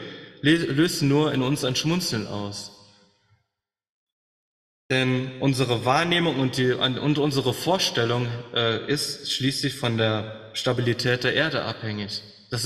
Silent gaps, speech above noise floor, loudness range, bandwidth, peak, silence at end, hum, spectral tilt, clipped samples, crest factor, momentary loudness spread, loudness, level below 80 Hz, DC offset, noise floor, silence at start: 3.90-4.89 s; 60 dB; 7 LU; 14.5 kHz; -6 dBFS; 0 s; none; -4.5 dB/octave; under 0.1%; 18 dB; 9 LU; -24 LUFS; -58 dBFS; under 0.1%; -83 dBFS; 0 s